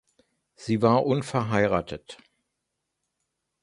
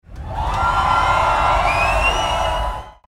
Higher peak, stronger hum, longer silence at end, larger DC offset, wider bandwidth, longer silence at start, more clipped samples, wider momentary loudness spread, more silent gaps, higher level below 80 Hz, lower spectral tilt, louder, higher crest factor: about the same, -6 dBFS vs -4 dBFS; neither; first, 1.5 s vs 0.15 s; neither; second, 11.5 kHz vs 16 kHz; first, 0.6 s vs 0.1 s; neither; first, 17 LU vs 9 LU; neither; second, -56 dBFS vs -26 dBFS; first, -7 dB/octave vs -4 dB/octave; second, -24 LUFS vs -17 LUFS; first, 22 dB vs 14 dB